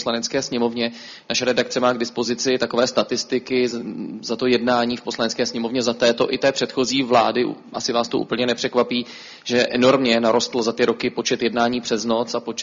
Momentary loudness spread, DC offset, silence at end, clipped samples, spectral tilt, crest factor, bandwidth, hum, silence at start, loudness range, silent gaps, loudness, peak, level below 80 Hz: 8 LU; under 0.1%; 0 s; under 0.1%; -3.5 dB/octave; 18 dB; 7.6 kHz; none; 0 s; 2 LU; none; -20 LUFS; -4 dBFS; -60 dBFS